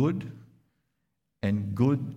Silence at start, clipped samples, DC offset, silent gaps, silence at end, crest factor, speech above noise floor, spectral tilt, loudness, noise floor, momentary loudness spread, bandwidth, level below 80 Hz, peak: 0 s; under 0.1%; under 0.1%; none; 0 s; 18 dB; 53 dB; -9 dB/octave; -29 LUFS; -80 dBFS; 11 LU; 8.2 kHz; -62 dBFS; -12 dBFS